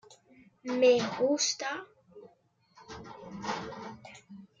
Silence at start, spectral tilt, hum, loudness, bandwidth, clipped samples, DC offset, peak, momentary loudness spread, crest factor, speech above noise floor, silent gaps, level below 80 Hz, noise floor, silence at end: 0.1 s; -3 dB/octave; none; -29 LUFS; 7.6 kHz; under 0.1%; under 0.1%; -14 dBFS; 25 LU; 20 dB; 39 dB; none; -70 dBFS; -67 dBFS; 0.15 s